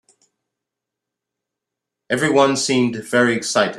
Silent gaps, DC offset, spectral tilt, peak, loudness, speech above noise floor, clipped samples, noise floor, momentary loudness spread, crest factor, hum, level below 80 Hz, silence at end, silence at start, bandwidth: none; under 0.1%; -4 dB/octave; 0 dBFS; -17 LUFS; 66 dB; under 0.1%; -83 dBFS; 5 LU; 20 dB; none; -62 dBFS; 0 s; 2.1 s; 13 kHz